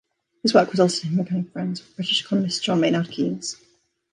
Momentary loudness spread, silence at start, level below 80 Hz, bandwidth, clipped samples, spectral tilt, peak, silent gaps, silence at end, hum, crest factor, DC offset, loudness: 11 LU; 0.45 s; -68 dBFS; 11 kHz; under 0.1%; -5 dB/octave; -2 dBFS; none; 0.6 s; none; 20 dB; under 0.1%; -22 LUFS